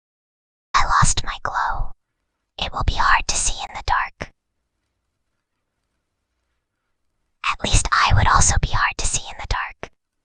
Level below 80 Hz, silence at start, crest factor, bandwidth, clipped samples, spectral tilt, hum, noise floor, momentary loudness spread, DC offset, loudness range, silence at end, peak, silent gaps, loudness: -28 dBFS; 0.75 s; 20 dB; 10 kHz; under 0.1%; -2 dB/octave; none; -76 dBFS; 15 LU; under 0.1%; 11 LU; 0.45 s; -2 dBFS; none; -20 LUFS